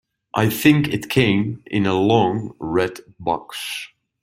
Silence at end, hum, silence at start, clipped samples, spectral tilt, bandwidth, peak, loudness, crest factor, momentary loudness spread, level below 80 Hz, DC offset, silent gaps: 0.35 s; none; 0.35 s; under 0.1%; -6 dB/octave; 16.5 kHz; -2 dBFS; -20 LUFS; 18 dB; 12 LU; -52 dBFS; under 0.1%; none